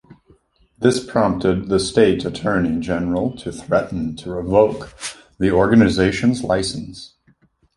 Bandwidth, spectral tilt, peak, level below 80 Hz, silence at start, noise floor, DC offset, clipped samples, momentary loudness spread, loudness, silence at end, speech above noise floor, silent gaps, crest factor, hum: 11.5 kHz; -6 dB/octave; -2 dBFS; -42 dBFS; 0.1 s; -58 dBFS; under 0.1%; under 0.1%; 15 LU; -18 LUFS; 0.7 s; 40 dB; none; 18 dB; none